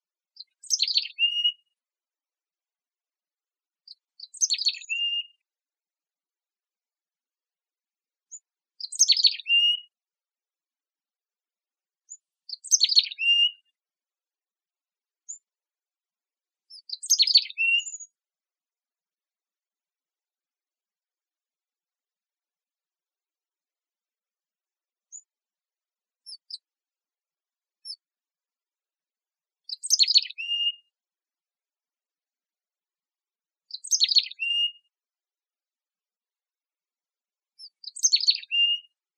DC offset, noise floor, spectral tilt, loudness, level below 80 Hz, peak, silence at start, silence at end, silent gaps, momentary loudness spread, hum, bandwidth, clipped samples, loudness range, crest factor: under 0.1%; under -90 dBFS; 13.5 dB/octave; -21 LUFS; under -90 dBFS; -4 dBFS; 0.4 s; 0.35 s; none; 23 LU; none; 11 kHz; under 0.1%; 12 LU; 26 dB